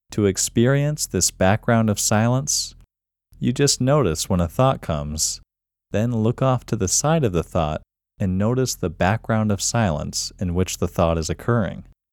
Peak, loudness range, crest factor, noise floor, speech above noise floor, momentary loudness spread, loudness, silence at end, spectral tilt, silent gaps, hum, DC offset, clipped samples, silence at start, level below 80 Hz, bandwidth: -2 dBFS; 2 LU; 20 dB; -62 dBFS; 41 dB; 7 LU; -21 LUFS; 0.3 s; -4.5 dB/octave; none; none; under 0.1%; under 0.1%; 0.1 s; -40 dBFS; 18.5 kHz